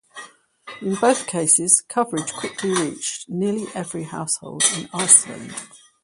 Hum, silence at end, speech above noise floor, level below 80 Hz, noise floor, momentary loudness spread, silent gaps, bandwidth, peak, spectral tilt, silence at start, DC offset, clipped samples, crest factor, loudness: none; 0.25 s; 21 dB; -66 dBFS; -43 dBFS; 19 LU; none; 16 kHz; 0 dBFS; -2.5 dB/octave; 0.15 s; under 0.1%; under 0.1%; 22 dB; -19 LUFS